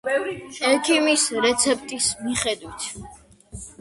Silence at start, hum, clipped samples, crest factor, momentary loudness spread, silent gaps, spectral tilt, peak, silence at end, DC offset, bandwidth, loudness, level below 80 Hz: 0.05 s; none; under 0.1%; 20 dB; 14 LU; none; -1.5 dB/octave; -4 dBFS; 0.1 s; under 0.1%; 11.5 kHz; -21 LUFS; -52 dBFS